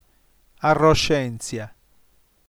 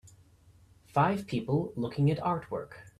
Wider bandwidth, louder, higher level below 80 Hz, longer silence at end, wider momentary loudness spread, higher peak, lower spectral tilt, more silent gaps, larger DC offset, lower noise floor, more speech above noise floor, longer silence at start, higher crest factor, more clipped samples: first, over 20 kHz vs 12 kHz; first, -20 LUFS vs -31 LUFS; first, -40 dBFS vs -60 dBFS; first, 0.85 s vs 0.1 s; first, 16 LU vs 7 LU; first, -4 dBFS vs -12 dBFS; second, -5 dB/octave vs -8 dB/octave; neither; neither; about the same, -60 dBFS vs -60 dBFS; first, 40 dB vs 30 dB; first, 0.6 s vs 0.05 s; about the same, 18 dB vs 20 dB; neither